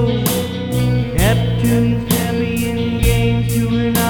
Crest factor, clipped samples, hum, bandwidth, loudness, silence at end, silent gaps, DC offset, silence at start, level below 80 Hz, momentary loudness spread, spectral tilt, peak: 16 dB; under 0.1%; none; 19 kHz; -17 LUFS; 0 s; none; under 0.1%; 0 s; -26 dBFS; 4 LU; -6 dB/octave; 0 dBFS